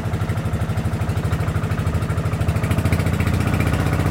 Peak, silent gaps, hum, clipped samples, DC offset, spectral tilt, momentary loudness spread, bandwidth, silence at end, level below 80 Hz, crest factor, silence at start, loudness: -6 dBFS; none; none; under 0.1%; under 0.1%; -7 dB/octave; 3 LU; 17 kHz; 0 s; -30 dBFS; 14 dB; 0 s; -21 LUFS